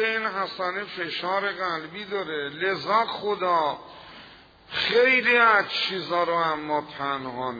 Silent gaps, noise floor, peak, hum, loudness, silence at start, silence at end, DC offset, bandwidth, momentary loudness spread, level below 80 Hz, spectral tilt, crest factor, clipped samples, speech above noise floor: none; -50 dBFS; -6 dBFS; none; -24 LUFS; 0 s; 0 s; under 0.1%; 5 kHz; 13 LU; -64 dBFS; -4.5 dB/octave; 20 dB; under 0.1%; 25 dB